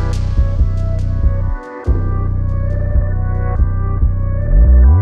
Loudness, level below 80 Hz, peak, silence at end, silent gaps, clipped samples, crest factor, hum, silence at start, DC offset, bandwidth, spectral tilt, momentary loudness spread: -17 LUFS; -14 dBFS; -2 dBFS; 0 s; none; under 0.1%; 12 dB; none; 0 s; under 0.1%; 5.2 kHz; -9 dB/octave; 7 LU